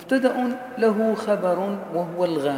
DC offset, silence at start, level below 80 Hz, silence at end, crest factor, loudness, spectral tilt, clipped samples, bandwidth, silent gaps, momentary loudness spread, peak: under 0.1%; 0 s; -76 dBFS; 0 s; 16 dB; -23 LUFS; -6.5 dB/octave; under 0.1%; 16.5 kHz; none; 7 LU; -6 dBFS